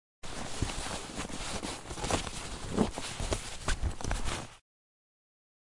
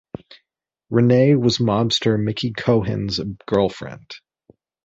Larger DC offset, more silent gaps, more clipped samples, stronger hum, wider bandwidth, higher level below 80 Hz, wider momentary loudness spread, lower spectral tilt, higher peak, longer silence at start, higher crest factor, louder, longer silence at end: neither; neither; neither; neither; first, 11.5 kHz vs 8 kHz; first, -42 dBFS vs -50 dBFS; second, 7 LU vs 23 LU; second, -4 dB/octave vs -6.5 dB/octave; second, -12 dBFS vs -4 dBFS; second, 0.25 s vs 0.9 s; first, 24 dB vs 16 dB; second, -36 LUFS vs -19 LUFS; first, 1.1 s vs 0.65 s